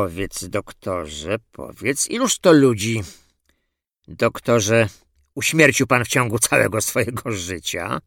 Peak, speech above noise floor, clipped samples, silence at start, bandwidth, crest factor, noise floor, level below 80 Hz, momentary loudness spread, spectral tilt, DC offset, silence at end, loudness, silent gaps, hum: 0 dBFS; 55 dB; under 0.1%; 0 s; 18.5 kHz; 20 dB; -75 dBFS; -50 dBFS; 13 LU; -4 dB/octave; under 0.1%; 0.05 s; -19 LUFS; none; none